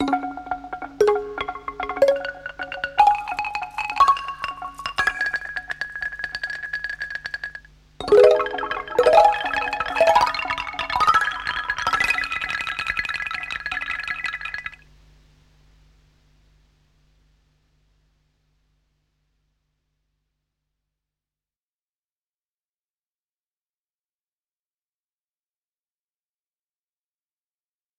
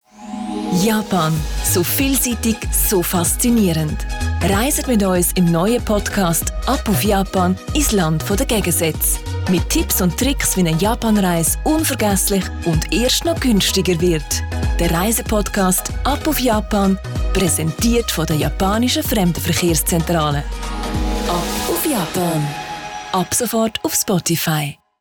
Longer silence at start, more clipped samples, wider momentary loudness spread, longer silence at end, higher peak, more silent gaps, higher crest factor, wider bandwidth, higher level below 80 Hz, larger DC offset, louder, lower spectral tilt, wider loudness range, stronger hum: second, 0 s vs 0.2 s; neither; first, 14 LU vs 6 LU; first, 13.25 s vs 0.25 s; first, 0 dBFS vs -6 dBFS; neither; first, 24 dB vs 10 dB; second, 16 kHz vs over 20 kHz; second, -52 dBFS vs -26 dBFS; neither; second, -22 LUFS vs -17 LUFS; about the same, -3 dB/octave vs -4 dB/octave; first, 11 LU vs 2 LU; neither